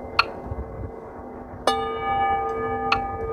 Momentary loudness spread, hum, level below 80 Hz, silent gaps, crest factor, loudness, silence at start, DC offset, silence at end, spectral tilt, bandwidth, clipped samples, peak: 15 LU; none; -42 dBFS; none; 26 dB; -25 LUFS; 0 s; under 0.1%; 0 s; -4.5 dB/octave; 14.5 kHz; under 0.1%; 0 dBFS